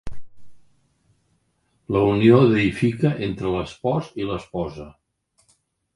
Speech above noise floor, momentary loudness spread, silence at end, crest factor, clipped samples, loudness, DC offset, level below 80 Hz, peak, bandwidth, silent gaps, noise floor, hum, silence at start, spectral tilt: 48 dB; 15 LU; 1.05 s; 20 dB; under 0.1%; -21 LUFS; under 0.1%; -46 dBFS; -2 dBFS; 11.5 kHz; none; -68 dBFS; none; 0.05 s; -8 dB/octave